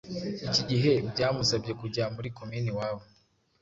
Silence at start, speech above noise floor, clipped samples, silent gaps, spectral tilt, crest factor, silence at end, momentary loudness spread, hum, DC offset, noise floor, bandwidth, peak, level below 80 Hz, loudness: 0.05 s; 37 dB; under 0.1%; none; -5 dB/octave; 18 dB; 0.55 s; 11 LU; none; under 0.1%; -67 dBFS; 7.8 kHz; -12 dBFS; -56 dBFS; -29 LUFS